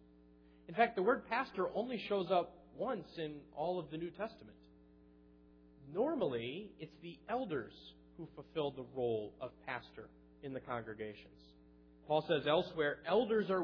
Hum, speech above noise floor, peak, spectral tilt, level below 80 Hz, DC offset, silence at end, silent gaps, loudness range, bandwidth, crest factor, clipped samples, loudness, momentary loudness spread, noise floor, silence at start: none; 25 dB; -18 dBFS; -3.5 dB/octave; -70 dBFS; under 0.1%; 0 s; none; 7 LU; 5.4 kHz; 20 dB; under 0.1%; -39 LUFS; 19 LU; -64 dBFS; 0.7 s